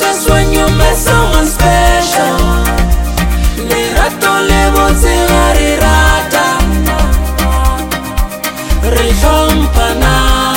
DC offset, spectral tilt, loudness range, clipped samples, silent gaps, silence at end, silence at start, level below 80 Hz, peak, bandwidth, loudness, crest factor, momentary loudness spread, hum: under 0.1%; -4.5 dB/octave; 3 LU; 0.1%; none; 0 s; 0 s; -12 dBFS; 0 dBFS; 17.5 kHz; -11 LUFS; 10 dB; 5 LU; none